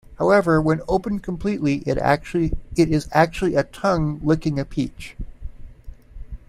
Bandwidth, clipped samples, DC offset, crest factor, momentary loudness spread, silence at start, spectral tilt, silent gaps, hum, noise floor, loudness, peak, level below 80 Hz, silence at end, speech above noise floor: 14.5 kHz; under 0.1%; under 0.1%; 20 dB; 19 LU; 0.1 s; -7 dB/octave; none; none; -40 dBFS; -21 LUFS; -2 dBFS; -36 dBFS; 0.1 s; 19 dB